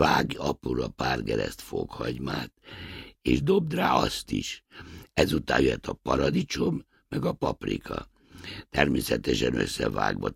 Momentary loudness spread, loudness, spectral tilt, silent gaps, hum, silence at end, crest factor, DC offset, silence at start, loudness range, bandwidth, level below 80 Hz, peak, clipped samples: 16 LU; -28 LUFS; -5 dB/octave; none; none; 0 s; 24 dB; under 0.1%; 0 s; 3 LU; 16 kHz; -44 dBFS; -4 dBFS; under 0.1%